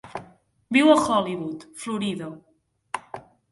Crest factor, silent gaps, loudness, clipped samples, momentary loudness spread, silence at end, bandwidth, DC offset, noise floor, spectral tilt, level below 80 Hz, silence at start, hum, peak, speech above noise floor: 22 dB; none; -23 LUFS; under 0.1%; 22 LU; 0.3 s; 11.5 kHz; under 0.1%; -53 dBFS; -4.5 dB/octave; -62 dBFS; 0.05 s; none; -4 dBFS; 31 dB